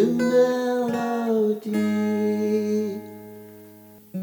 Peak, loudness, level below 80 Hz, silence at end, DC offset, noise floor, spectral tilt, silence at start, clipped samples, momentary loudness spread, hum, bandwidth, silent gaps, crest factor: -8 dBFS; -23 LUFS; -80 dBFS; 0 s; under 0.1%; -47 dBFS; -6.5 dB/octave; 0 s; under 0.1%; 19 LU; none; over 20 kHz; none; 16 dB